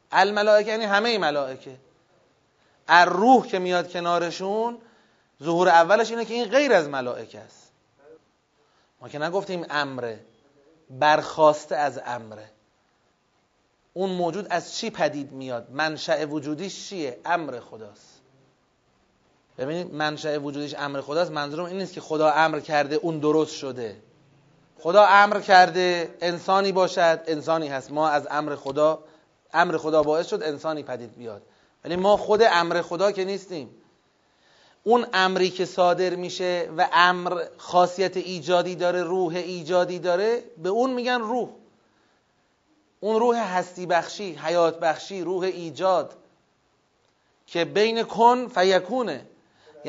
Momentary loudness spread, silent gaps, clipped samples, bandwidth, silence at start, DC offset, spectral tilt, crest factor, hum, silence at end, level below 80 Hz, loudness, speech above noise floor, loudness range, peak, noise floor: 15 LU; none; under 0.1%; 7.8 kHz; 0.1 s; under 0.1%; -4.5 dB/octave; 24 dB; none; 0 s; -70 dBFS; -23 LUFS; 44 dB; 10 LU; 0 dBFS; -67 dBFS